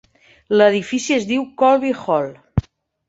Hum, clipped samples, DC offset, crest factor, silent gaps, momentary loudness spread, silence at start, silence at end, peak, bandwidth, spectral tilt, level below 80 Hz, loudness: none; under 0.1%; under 0.1%; 16 dB; none; 10 LU; 0.5 s; 0.5 s; -2 dBFS; 8 kHz; -5.5 dB/octave; -40 dBFS; -18 LUFS